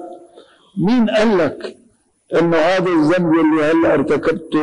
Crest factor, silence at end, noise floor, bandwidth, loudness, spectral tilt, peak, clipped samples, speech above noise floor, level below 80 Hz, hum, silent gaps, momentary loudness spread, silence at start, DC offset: 8 dB; 0 s; -55 dBFS; 10 kHz; -15 LUFS; -7 dB/octave; -8 dBFS; under 0.1%; 41 dB; -50 dBFS; none; none; 11 LU; 0 s; under 0.1%